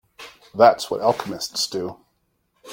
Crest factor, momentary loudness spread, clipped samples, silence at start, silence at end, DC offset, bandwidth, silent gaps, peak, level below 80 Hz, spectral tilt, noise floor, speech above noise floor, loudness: 22 dB; 20 LU; under 0.1%; 0.2 s; 0 s; under 0.1%; 16.5 kHz; none; -2 dBFS; -64 dBFS; -3.5 dB/octave; -69 dBFS; 49 dB; -20 LUFS